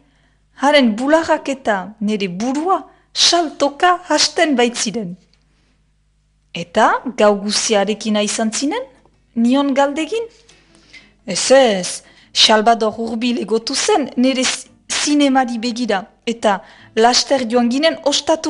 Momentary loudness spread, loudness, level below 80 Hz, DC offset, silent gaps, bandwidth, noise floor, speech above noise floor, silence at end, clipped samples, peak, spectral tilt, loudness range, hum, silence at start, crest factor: 11 LU; -16 LUFS; -56 dBFS; under 0.1%; none; 11.5 kHz; -59 dBFS; 43 dB; 0 s; under 0.1%; 0 dBFS; -2.5 dB/octave; 3 LU; none; 0.6 s; 16 dB